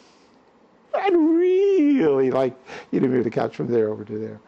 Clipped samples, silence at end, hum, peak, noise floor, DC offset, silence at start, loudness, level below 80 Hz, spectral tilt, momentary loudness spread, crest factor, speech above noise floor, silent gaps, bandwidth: under 0.1%; 0.1 s; none; -10 dBFS; -55 dBFS; under 0.1%; 0.95 s; -21 LUFS; -66 dBFS; -8 dB/octave; 11 LU; 12 dB; 34 dB; none; 7.2 kHz